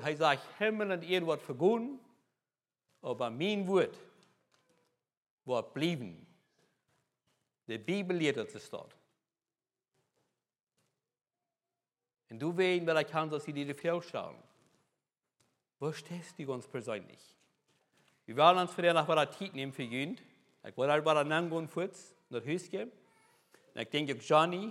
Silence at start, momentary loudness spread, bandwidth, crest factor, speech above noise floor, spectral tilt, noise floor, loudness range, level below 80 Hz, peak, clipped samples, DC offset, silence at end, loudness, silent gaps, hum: 0 s; 16 LU; 14 kHz; 26 dB; over 57 dB; -5.5 dB/octave; under -90 dBFS; 10 LU; under -90 dBFS; -10 dBFS; under 0.1%; under 0.1%; 0 s; -33 LUFS; 5.17-5.38 s, 10.60-10.67 s; none